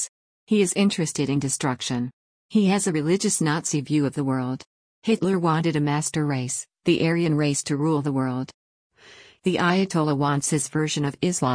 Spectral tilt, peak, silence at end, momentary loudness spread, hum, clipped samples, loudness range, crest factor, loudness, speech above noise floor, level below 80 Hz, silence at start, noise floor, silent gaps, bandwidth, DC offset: -5 dB/octave; -8 dBFS; 0 s; 7 LU; none; under 0.1%; 2 LU; 16 dB; -23 LUFS; 28 dB; -62 dBFS; 0 s; -50 dBFS; 0.09-0.47 s, 2.13-2.49 s, 4.66-5.02 s, 8.54-8.90 s; 10.5 kHz; under 0.1%